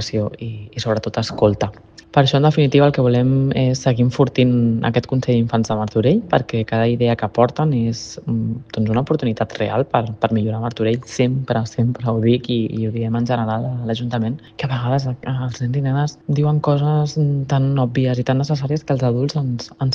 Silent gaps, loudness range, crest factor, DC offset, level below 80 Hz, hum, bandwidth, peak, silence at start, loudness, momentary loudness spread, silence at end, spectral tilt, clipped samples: none; 4 LU; 18 dB; under 0.1%; -48 dBFS; none; 7.4 kHz; 0 dBFS; 0 s; -19 LUFS; 8 LU; 0 s; -7 dB/octave; under 0.1%